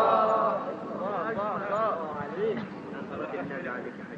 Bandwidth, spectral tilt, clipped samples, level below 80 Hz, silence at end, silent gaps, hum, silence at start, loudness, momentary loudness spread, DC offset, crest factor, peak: 7.6 kHz; -7.5 dB/octave; under 0.1%; -70 dBFS; 0 s; none; none; 0 s; -30 LUFS; 12 LU; under 0.1%; 20 dB; -8 dBFS